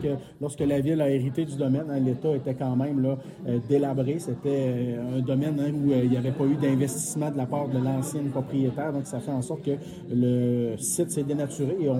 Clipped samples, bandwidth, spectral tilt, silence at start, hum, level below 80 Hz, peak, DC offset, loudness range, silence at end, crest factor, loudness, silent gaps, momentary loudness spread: under 0.1%; 15 kHz; -7 dB/octave; 0 s; none; -60 dBFS; -10 dBFS; under 0.1%; 2 LU; 0 s; 16 dB; -27 LUFS; none; 6 LU